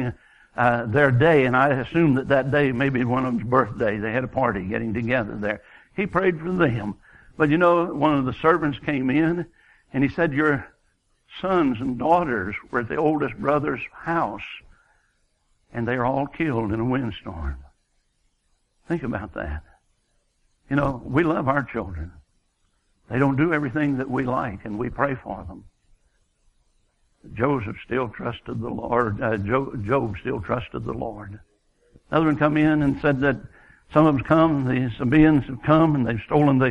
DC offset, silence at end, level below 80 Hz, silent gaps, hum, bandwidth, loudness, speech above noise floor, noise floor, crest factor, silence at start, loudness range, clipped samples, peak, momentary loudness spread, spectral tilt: under 0.1%; 0 s; -44 dBFS; none; none; 7.2 kHz; -22 LUFS; 46 dB; -68 dBFS; 20 dB; 0 s; 10 LU; under 0.1%; -4 dBFS; 13 LU; -9 dB/octave